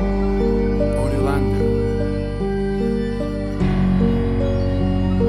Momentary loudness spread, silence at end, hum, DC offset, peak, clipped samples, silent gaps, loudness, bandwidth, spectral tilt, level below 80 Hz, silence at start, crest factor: 5 LU; 0 s; none; under 0.1%; -6 dBFS; under 0.1%; none; -20 LUFS; 11.5 kHz; -8.5 dB/octave; -26 dBFS; 0 s; 12 dB